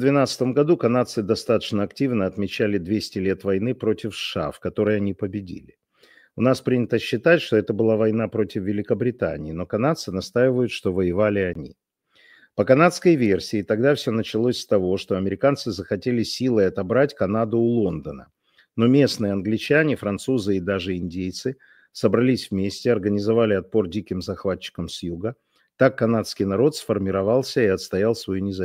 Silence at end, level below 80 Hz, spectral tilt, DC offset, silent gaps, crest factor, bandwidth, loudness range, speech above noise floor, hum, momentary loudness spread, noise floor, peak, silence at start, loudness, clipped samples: 0 s; -54 dBFS; -6.5 dB/octave; under 0.1%; none; 20 dB; 16 kHz; 3 LU; 37 dB; none; 10 LU; -58 dBFS; -2 dBFS; 0 s; -22 LUFS; under 0.1%